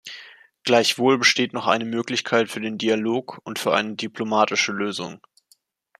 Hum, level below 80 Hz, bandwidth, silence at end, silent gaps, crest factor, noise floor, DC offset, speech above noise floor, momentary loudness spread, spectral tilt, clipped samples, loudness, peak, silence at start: none; -70 dBFS; 15 kHz; 0.8 s; none; 22 dB; -62 dBFS; under 0.1%; 40 dB; 13 LU; -3 dB/octave; under 0.1%; -22 LUFS; -2 dBFS; 0.05 s